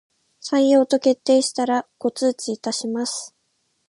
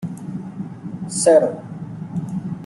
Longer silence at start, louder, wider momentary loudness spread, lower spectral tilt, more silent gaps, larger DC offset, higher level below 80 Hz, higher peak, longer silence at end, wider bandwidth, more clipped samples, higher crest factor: first, 0.45 s vs 0 s; about the same, -21 LUFS vs -20 LUFS; second, 11 LU vs 18 LU; second, -3 dB/octave vs -5.5 dB/octave; neither; neither; second, -76 dBFS vs -60 dBFS; second, -6 dBFS vs -2 dBFS; first, 0.6 s vs 0 s; about the same, 11.5 kHz vs 12 kHz; neither; about the same, 16 dB vs 18 dB